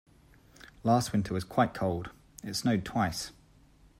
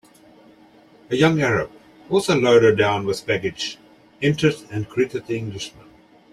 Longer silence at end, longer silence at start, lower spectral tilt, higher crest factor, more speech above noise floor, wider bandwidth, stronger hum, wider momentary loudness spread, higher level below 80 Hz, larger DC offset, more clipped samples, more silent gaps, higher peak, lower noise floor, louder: about the same, 0.7 s vs 0.65 s; second, 0.65 s vs 1.1 s; about the same, -5.5 dB/octave vs -5.5 dB/octave; about the same, 20 dB vs 18 dB; about the same, 30 dB vs 31 dB; first, 16 kHz vs 13.5 kHz; neither; second, 12 LU vs 15 LU; about the same, -58 dBFS vs -54 dBFS; neither; neither; neither; second, -12 dBFS vs -4 dBFS; first, -60 dBFS vs -51 dBFS; second, -31 LUFS vs -20 LUFS